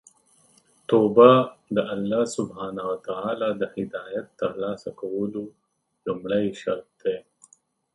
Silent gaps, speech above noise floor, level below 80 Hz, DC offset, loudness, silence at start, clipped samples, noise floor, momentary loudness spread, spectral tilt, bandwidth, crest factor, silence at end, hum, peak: none; 37 dB; -64 dBFS; under 0.1%; -24 LUFS; 0.9 s; under 0.1%; -60 dBFS; 17 LU; -6.5 dB/octave; 11.5 kHz; 24 dB; 0.75 s; none; 0 dBFS